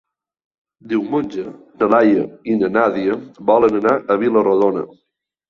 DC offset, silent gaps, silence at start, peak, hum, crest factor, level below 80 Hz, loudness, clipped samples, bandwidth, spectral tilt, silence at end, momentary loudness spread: under 0.1%; none; 0.85 s; -2 dBFS; none; 16 dB; -58 dBFS; -17 LUFS; under 0.1%; 7 kHz; -8 dB/octave; 0.65 s; 12 LU